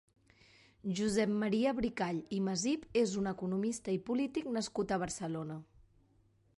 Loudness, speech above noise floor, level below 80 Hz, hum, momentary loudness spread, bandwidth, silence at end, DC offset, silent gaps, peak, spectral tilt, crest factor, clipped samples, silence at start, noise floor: -35 LUFS; 35 dB; -62 dBFS; none; 8 LU; 11.5 kHz; 0.95 s; under 0.1%; none; -20 dBFS; -5 dB/octave; 16 dB; under 0.1%; 0.85 s; -70 dBFS